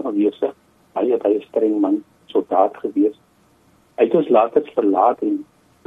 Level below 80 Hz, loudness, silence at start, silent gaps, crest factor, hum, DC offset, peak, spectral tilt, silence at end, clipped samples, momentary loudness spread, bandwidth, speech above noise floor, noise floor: -68 dBFS; -19 LUFS; 0 s; none; 16 dB; none; under 0.1%; -2 dBFS; -8.5 dB/octave; 0.45 s; under 0.1%; 9 LU; 3.9 kHz; 38 dB; -56 dBFS